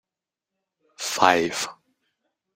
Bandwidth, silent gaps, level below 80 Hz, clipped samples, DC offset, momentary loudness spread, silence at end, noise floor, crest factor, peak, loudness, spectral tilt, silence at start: 16 kHz; none; -68 dBFS; under 0.1%; under 0.1%; 13 LU; 0.8 s; -88 dBFS; 26 dB; 0 dBFS; -22 LUFS; -2 dB/octave; 1 s